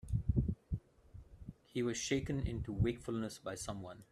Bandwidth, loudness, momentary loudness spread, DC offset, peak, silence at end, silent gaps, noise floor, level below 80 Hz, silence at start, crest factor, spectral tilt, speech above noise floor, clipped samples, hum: 13.5 kHz; -39 LUFS; 18 LU; under 0.1%; -20 dBFS; 0.1 s; none; -58 dBFS; -48 dBFS; 0.05 s; 18 dB; -5.5 dB/octave; 19 dB; under 0.1%; none